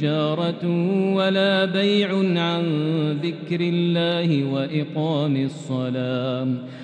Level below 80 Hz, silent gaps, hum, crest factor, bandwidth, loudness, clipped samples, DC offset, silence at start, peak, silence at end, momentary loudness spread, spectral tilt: -72 dBFS; none; none; 14 dB; 9.2 kHz; -22 LUFS; under 0.1%; under 0.1%; 0 s; -8 dBFS; 0 s; 6 LU; -7.5 dB/octave